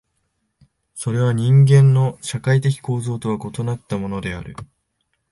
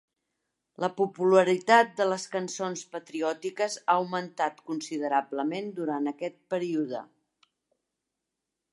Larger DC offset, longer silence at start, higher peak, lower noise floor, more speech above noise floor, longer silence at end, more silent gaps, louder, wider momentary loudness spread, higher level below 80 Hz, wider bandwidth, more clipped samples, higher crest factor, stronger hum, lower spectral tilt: neither; first, 0.95 s vs 0.8 s; about the same, -4 dBFS vs -6 dBFS; second, -71 dBFS vs -85 dBFS; second, 54 dB vs 58 dB; second, 0.7 s vs 1.7 s; neither; first, -18 LUFS vs -28 LUFS; first, 17 LU vs 12 LU; first, -48 dBFS vs -84 dBFS; about the same, 11.5 kHz vs 11.5 kHz; neither; second, 16 dB vs 22 dB; neither; first, -7 dB/octave vs -4.5 dB/octave